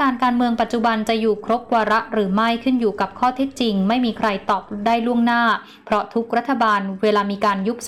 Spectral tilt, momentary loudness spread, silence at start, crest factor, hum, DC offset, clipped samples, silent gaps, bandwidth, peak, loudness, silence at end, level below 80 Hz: -5.5 dB/octave; 4 LU; 0 s; 10 dB; none; 0.2%; under 0.1%; none; 13 kHz; -8 dBFS; -19 LUFS; 0 s; -54 dBFS